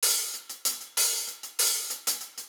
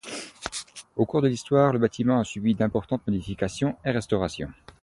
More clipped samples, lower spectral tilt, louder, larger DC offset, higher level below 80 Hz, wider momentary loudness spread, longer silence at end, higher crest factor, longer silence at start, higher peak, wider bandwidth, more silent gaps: neither; second, 4 dB/octave vs -6 dB/octave; about the same, -27 LUFS vs -26 LUFS; neither; second, under -90 dBFS vs -50 dBFS; second, 6 LU vs 14 LU; second, 0 s vs 0.3 s; about the same, 20 dB vs 18 dB; about the same, 0 s vs 0.05 s; second, -12 dBFS vs -8 dBFS; first, over 20 kHz vs 11.5 kHz; neither